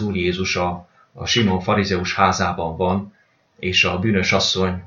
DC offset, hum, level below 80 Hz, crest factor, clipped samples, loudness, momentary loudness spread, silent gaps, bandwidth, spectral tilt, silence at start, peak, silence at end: under 0.1%; none; -46 dBFS; 20 dB; under 0.1%; -19 LUFS; 9 LU; none; 7.4 kHz; -4.5 dB/octave; 0 s; 0 dBFS; 0 s